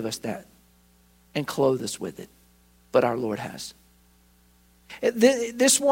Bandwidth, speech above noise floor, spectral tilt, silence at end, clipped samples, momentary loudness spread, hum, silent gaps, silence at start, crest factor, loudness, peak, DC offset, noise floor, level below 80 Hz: 16.5 kHz; 35 dB; -3.5 dB/octave; 0 s; under 0.1%; 18 LU; 60 Hz at -60 dBFS; none; 0 s; 22 dB; -25 LUFS; -6 dBFS; under 0.1%; -59 dBFS; -62 dBFS